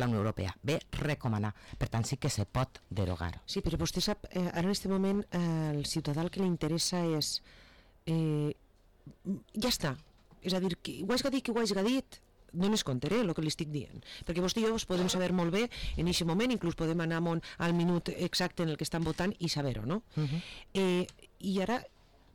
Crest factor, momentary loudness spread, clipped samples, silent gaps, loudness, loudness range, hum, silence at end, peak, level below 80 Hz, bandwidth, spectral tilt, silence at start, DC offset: 10 dB; 7 LU; under 0.1%; none; -33 LUFS; 3 LU; none; 0.5 s; -24 dBFS; -50 dBFS; 18.5 kHz; -5 dB/octave; 0 s; under 0.1%